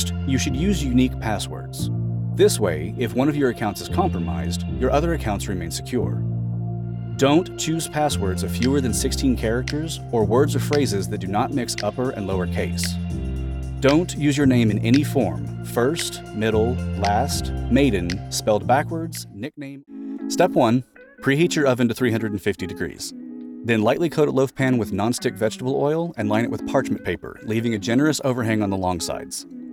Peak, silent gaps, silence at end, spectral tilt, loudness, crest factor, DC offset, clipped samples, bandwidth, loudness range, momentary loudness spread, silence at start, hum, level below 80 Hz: -4 dBFS; none; 0 s; -5.5 dB/octave; -22 LUFS; 16 dB; under 0.1%; under 0.1%; 18.5 kHz; 2 LU; 10 LU; 0 s; none; -38 dBFS